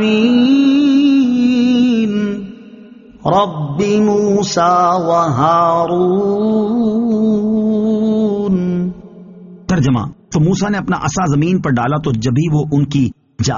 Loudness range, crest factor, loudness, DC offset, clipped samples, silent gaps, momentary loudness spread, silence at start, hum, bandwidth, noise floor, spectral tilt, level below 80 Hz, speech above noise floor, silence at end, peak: 3 LU; 12 dB; -14 LUFS; under 0.1%; under 0.1%; none; 8 LU; 0 s; none; 7.4 kHz; -38 dBFS; -6.5 dB/octave; -44 dBFS; 25 dB; 0 s; 0 dBFS